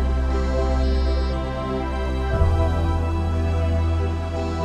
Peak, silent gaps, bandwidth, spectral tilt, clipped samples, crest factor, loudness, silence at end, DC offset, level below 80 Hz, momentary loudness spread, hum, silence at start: -6 dBFS; none; 9 kHz; -7.5 dB/octave; under 0.1%; 14 dB; -23 LUFS; 0 s; under 0.1%; -24 dBFS; 5 LU; none; 0 s